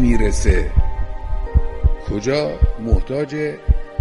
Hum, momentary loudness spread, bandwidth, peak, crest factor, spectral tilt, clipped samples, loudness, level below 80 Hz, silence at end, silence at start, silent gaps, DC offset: none; 7 LU; 11.5 kHz; -4 dBFS; 14 dB; -6.5 dB/octave; under 0.1%; -21 LUFS; -18 dBFS; 0 s; 0 s; none; under 0.1%